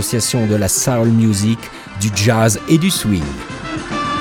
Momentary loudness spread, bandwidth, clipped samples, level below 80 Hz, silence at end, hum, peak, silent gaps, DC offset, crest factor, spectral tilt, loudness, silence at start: 12 LU; 20 kHz; under 0.1%; -40 dBFS; 0 s; none; 0 dBFS; none; under 0.1%; 14 dB; -4.5 dB/octave; -16 LUFS; 0 s